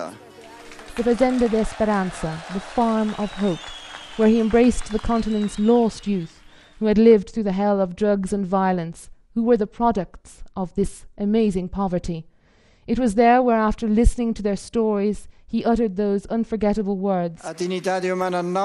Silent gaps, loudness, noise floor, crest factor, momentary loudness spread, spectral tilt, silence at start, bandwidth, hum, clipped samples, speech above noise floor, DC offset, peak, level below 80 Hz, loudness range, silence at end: none; -21 LUFS; -56 dBFS; 18 dB; 13 LU; -6.5 dB/octave; 0 s; 11.5 kHz; none; under 0.1%; 35 dB; under 0.1%; -4 dBFS; -36 dBFS; 3 LU; 0 s